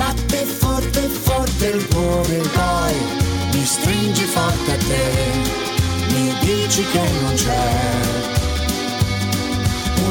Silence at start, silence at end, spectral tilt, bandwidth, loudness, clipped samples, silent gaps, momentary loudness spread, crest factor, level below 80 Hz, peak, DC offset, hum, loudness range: 0 s; 0 s; -4.5 dB/octave; 19.5 kHz; -18 LUFS; under 0.1%; none; 3 LU; 14 dB; -28 dBFS; -4 dBFS; under 0.1%; none; 1 LU